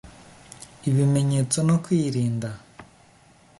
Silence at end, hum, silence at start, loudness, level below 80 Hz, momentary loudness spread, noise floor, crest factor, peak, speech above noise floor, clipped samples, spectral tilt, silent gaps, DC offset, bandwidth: 0.75 s; none; 0.05 s; -23 LUFS; -58 dBFS; 20 LU; -55 dBFS; 16 dB; -8 dBFS; 33 dB; under 0.1%; -6.5 dB/octave; none; under 0.1%; 11.5 kHz